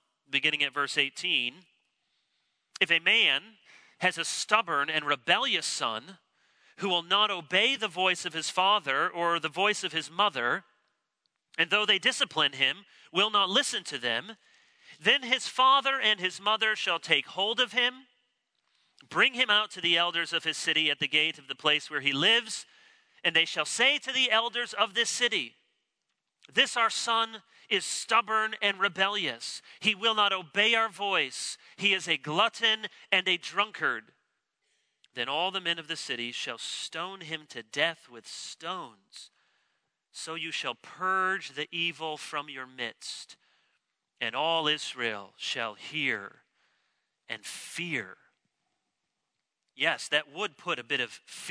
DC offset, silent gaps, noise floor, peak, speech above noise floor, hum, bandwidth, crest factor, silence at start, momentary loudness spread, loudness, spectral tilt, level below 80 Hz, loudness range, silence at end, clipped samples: under 0.1%; none; -84 dBFS; -8 dBFS; 55 dB; none; 11 kHz; 24 dB; 0.3 s; 13 LU; -27 LUFS; -1.5 dB/octave; -86 dBFS; 9 LU; 0 s; under 0.1%